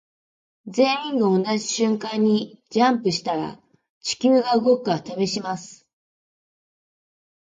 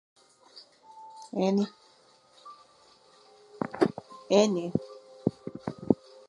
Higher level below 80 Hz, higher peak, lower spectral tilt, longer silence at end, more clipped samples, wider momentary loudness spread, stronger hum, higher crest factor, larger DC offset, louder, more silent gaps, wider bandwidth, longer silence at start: about the same, -68 dBFS vs -66 dBFS; about the same, -4 dBFS vs -6 dBFS; second, -4.5 dB/octave vs -6 dB/octave; first, 1.8 s vs 0.35 s; neither; second, 10 LU vs 26 LU; neither; second, 18 dB vs 26 dB; neither; first, -22 LUFS vs -29 LUFS; first, 3.90-4.01 s vs none; second, 9.4 kHz vs 11 kHz; about the same, 0.65 s vs 0.55 s